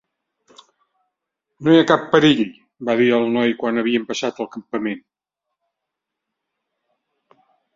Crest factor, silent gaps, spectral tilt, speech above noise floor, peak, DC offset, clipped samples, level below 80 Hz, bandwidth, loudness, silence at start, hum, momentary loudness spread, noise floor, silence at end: 20 dB; none; -5.5 dB/octave; 64 dB; 0 dBFS; under 0.1%; under 0.1%; -62 dBFS; 7.6 kHz; -18 LUFS; 1.6 s; none; 13 LU; -82 dBFS; 2.75 s